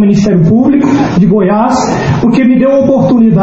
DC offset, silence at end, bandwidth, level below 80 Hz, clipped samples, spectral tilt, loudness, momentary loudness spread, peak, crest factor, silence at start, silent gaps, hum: under 0.1%; 0 s; 8 kHz; -34 dBFS; 0.1%; -7.5 dB/octave; -8 LUFS; 3 LU; 0 dBFS; 6 dB; 0 s; none; none